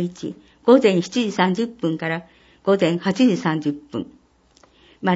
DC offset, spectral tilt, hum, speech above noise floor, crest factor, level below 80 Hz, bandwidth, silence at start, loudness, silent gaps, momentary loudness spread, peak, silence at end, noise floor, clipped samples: under 0.1%; -6 dB/octave; none; 36 dB; 18 dB; -62 dBFS; 8 kHz; 0 s; -20 LUFS; none; 16 LU; -2 dBFS; 0 s; -56 dBFS; under 0.1%